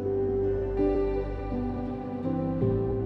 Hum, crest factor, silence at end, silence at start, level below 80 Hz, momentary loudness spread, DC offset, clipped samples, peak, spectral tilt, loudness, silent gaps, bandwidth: none; 14 dB; 0 s; 0 s; -38 dBFS; 6 LU; under 0.1%; under 0.1%; -14 dBFS; -11 dB/octave; -29 LUFS; none; 5.4 kHz